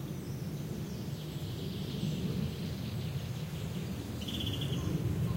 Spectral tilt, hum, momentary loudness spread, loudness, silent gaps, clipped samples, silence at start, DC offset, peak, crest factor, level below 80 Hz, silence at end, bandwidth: -6 dB/octave; none; 5 LU; -37 LUFS; none; under 0.1%; 0 s; under 0.1%; -22 dBFS; 14 dB; -50 dBFS; 0 s; 16 kHz